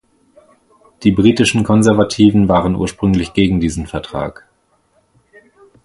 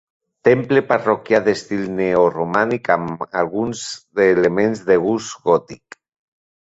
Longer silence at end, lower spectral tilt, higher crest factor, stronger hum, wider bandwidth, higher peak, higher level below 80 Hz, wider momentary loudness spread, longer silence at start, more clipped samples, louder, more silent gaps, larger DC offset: first, 1.55 s vs 0.95 s; about the same, -6 dB/octave vs -5.5 dB/octave; about the same, 16 dB vs 16 dB; neither; first, 11.5 kHz vs 8 kHz; about the same, 0 dBFS vs -2 dBFS; first, -36 dBFS vs -56 dBFS; first, 12 LU vs 8 LU; first, 1 s vs 0.45 s; neither; first, -14 LUFS vs -18 LUFS; neither; neither